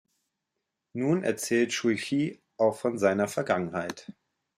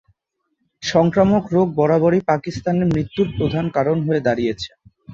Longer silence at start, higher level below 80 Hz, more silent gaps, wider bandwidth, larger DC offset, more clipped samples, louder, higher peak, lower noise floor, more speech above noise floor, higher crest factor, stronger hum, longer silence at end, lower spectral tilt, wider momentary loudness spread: first, 0.95 s vs 0.8 s; second, -74 dBFS vs -46 dBFS; neither; first, 16 kHz vs 7.6 kHz; neither; neither; second, -28 LUFS vs -18 LUFS; second, -8 dBFS vs -2 dBFS; first, -84 dBFS vs -73 dBFS; about the same, 57 dB vs 55 dB; about the same, 20 dB vs 18 dB; neither; first, 0.45 s vs 0 s; second, -5 dB/octave vs -7 dB/octave; about the same, 8 LU vs 7 LU